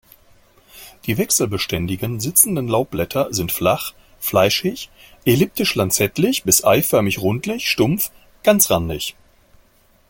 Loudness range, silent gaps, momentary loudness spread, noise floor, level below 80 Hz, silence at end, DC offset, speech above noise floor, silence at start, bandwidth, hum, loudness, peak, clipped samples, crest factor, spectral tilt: 2 LU; none; 11 LU; -55 dBFS; -46 dBFS; 1 s; under 0.1%; 36 dB; 0.75 s; 17 kHz; none; -18 LUFS; 0 dBFS; under 0.1%; 20 dB; -3.5 dB/octave